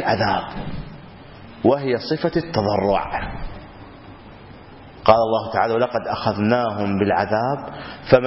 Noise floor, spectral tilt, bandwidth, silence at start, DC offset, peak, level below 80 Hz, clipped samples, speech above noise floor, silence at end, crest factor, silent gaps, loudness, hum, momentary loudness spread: -41 dBFS; -9.5 dB/octave; 6 kHz; 0 s; under 0.1%; 0 dBFS; -42 dBFS; under 0.1%; 22 dB; 0 s; 22 dB; none; -20 LUFS; none; 24 LU